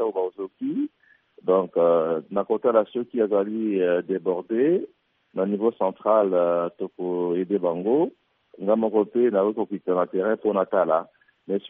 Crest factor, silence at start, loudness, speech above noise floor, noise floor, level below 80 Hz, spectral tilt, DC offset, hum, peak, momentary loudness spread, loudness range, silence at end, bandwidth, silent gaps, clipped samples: 16 dB; 0 s; -24 LUFS; 39 dB; -61 dBFS; -74 dBFS; -6.5 dB/octave; under 0.1%; none; -6 dBFS; 9 LU; 1 LU; 0 s; 3.8 kHz; none; under 0.1%